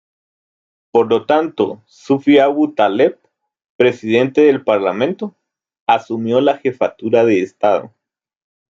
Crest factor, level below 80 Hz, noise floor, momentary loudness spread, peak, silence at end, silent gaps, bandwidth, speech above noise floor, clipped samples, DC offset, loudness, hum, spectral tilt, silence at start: 14 dB; -64 dBFS; under -90 dBFS; 8 LU; -2 dBFS; 0.9 s; 3.70-3.79 s, 5.80-5.86 s; 7.6 kHz; over 76 dB; under 0.1%; under 0.1%; -15 LUFS; none; -6.5 dB/octave; 0.95 s